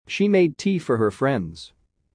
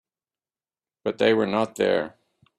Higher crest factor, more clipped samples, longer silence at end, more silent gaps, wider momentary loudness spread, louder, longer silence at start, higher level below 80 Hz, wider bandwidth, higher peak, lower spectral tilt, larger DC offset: second, 14 dB vs 20 dB; neither; about the same, 0.5 s vs 0.5 s; neither; about the same, 12 LU vs 11 LU; first, -21 LUFS vs -24 LUFS; second, 0.1 s vs 1.05 s; first, -58 dBFS vs -68 dBFS; second, 10.5 kHz vs 12.5 kHz; about the same, -8 dBFS vs -6 dBFS; about the same, -6.5 dB/octave vs -5.5 dB/octave; neither